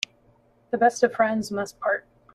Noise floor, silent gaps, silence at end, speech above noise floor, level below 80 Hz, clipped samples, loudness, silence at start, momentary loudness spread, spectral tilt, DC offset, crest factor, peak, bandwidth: -60 dBFS; none; 0.35 s; 37 dB; -66 dBFS; under 0.1%; -24 LUFS; 0.75 s; 11 LU; -4 dB/octave; under 0.1%; 20 dB; -6 dBFS; 13.5 kHz